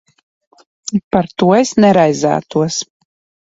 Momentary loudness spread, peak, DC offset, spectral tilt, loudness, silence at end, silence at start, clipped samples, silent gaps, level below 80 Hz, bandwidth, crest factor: 12 LU; 0 dBFS; under 0.1%; -5.5 dB/octave; -14 LUFS; 0.55 s; 0.85 s; under 0.1%; 1.04-1.11 s; -52 dBFS; 8 kHz; 14 dB